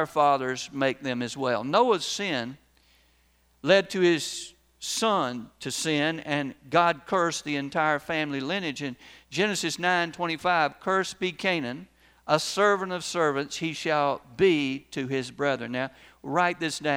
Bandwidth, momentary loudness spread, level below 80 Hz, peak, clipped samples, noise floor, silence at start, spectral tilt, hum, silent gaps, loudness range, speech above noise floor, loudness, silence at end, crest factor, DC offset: over 20 kHz; 10 LU; -66 dBFS; -6 dBFS; under 0.1%; -64 dBFS; 0 s; -4 dB/octave; none; none; 1 LU; 38 dB; -26 LUFS; 0 s; 20 dB; under 0.1%